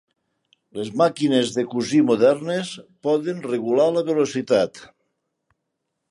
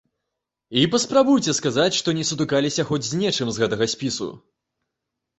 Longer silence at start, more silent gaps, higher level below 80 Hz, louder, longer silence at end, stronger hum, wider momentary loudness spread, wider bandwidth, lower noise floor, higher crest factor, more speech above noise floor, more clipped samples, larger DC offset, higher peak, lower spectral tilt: about the same, 0.75 s vs 0.7 s; neither; second, -68 dBFS vs -58 dBFS; about the same, -21 LUFS vs -21 LUFS; first, 1.25 s vs 1 s; neither; first, 11 LU vs 7 LU; first, 11.5 kHz vs 8.4 kHz; second, -78 dBFS vs -82 dBFS; about the same, 18 dB vs 20 dB; about the same, 58 dB vs 61 dB; neither; neither; about the same, -4 dBFS vs -4 dBFS; first, -5.5 dB/octave vs -4 dB/octave